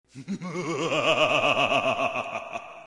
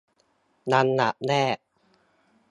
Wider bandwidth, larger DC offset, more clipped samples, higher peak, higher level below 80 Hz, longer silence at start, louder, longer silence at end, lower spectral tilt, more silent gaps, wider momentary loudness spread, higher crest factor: about the same, 11.5 kHz vs 11 kHz; neither; neither; about the same, -8 dBFS vs -6 dBFS; first, -66 dBFS vs -72 dBFS; second, 0.15 s vs 0.65 s; about the same, -24 LUFS vs -24 LUFS; second, 0.05 s vs 0.95 s; second, -4 dB/octave vs -5.5 dB/octave; neither; first, 14 LU vs 11 LU; about the same, 18 dB vs 22 dB